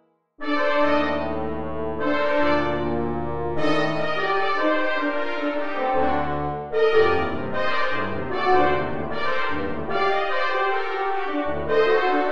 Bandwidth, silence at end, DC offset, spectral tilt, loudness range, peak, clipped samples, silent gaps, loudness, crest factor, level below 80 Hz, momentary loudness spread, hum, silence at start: 8 kHz; 0 s; 4%; -6.5 dB/octave; 1 LU; -6 dBFS; under 0.1%; none; -23 LUFS; 16 dB; -44 dBFS; 7 LU; none; 0 s